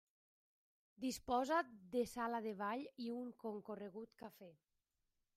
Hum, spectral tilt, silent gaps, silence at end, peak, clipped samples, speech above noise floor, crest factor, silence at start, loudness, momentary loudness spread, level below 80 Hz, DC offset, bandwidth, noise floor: none; -4.5 dB/octave; none; 0.85 s; -26 dBFS; under 0.1%; 44 dB; 20 dB; 1 s; -44 LUFS; 17 LU; -76 dBFS; under 0.1%; 15.5 kHz; -88 dBFS